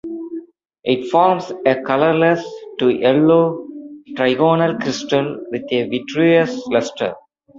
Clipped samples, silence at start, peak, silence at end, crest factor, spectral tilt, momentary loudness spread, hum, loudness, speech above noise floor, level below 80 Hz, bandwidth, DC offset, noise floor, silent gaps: under 0.1%; 0.05 s; -2 dBFS; 0 s; 16 dB; -6 dB/octave; 15 LU; none; -17 LUFS; 20 dB; -60 dBFS; 7.6 kHz; under 0.1%; -36 dBFS; none